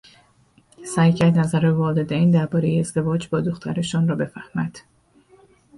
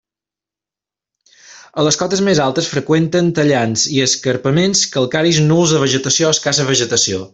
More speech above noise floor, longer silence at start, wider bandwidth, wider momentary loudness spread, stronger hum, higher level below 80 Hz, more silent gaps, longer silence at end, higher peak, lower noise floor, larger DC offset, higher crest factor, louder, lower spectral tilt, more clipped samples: second, 38 dB vs 74 dB; second, 0.8 s vs 1.5 s; first, 11.5 kHz vs 8.4 kHz; first, 10 LU vs 3 LU; neither; about the same, -54 dBFS vs -52 dBFS; neither; first, 1 s vs 0.05 s; second, -6 dBFS vs 0 dBFS; second, -57 dBFS vs -88 dBFS; neither; about the same, 16 dB vs 14 dB; second, -21 LUFS vs -14 LUFS; first, -7 dB/octave vs -4 dB/octave; neither